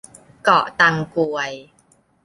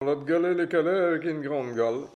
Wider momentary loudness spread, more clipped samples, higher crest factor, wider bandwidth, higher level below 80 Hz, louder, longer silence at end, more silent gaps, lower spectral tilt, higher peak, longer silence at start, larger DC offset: first, 12 LU vs 5 LU; neither; first, 20 dB vs 12 dB; first, 11.5 kHz vs 9 kHz; first, -60 dBFS vs -76 dBFS; first, -18 LUFS vs -26 LUFS; first, 0.65 s vs 0.1 s; neither; second, -4.5 dB/octave vs -7 dB/octave; first, -2 dBFS vs -12 dBFS; first, 0.45 s vs 0 s; neither